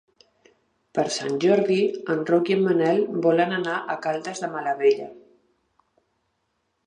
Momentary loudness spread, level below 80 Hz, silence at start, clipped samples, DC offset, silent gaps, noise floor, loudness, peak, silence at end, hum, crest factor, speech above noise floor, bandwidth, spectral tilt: 8 LU; -74 dBFS; 0.95 s; under 0.1%; under 0.1%; none; -74 dBFS; -23 LUFS; -6 dBFS; 1.7 s; none; 18 dB; 52 dB; 10.5 kHz; -5.5 dB/octave